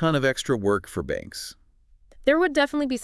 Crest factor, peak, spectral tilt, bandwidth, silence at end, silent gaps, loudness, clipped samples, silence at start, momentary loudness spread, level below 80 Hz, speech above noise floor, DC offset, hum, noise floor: 18 dB; -6 dBFS; -5 dB/octave; 12 kHz; 0 s; none; -24 LUFS; under 0.1%; 0 s; 14 LU; -50 dBFS; 33 dB; under 0.1%; none; -56 dBFS